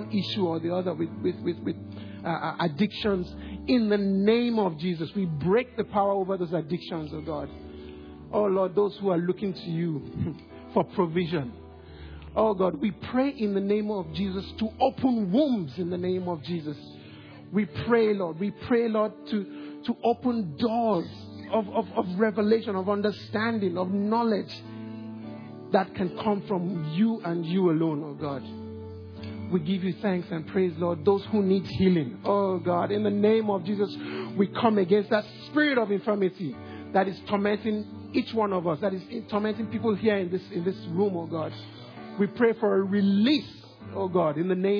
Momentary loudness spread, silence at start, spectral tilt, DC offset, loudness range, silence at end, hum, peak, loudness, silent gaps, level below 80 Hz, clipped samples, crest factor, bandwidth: 15 LU; 0 s; -9 dB/octave; under 0.1%; 4 LU; 0 s; none; -8 dBFS; -27 LUFS; none; -56 dBFS; under 0.1%; 20 dB; 5.4 kHz